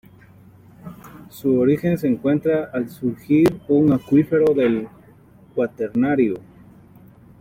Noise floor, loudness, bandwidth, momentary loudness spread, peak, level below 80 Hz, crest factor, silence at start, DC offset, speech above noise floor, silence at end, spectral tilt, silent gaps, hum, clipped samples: -49 dBFS; -19 LUFS; 16 kHz; 19 LU; -6 dBFS; -54 dBFS; 14 dB; 0.85 s; under 0.1%; 30 dB; 1 s; -8.5 dB/octave; none; none; under 0.1%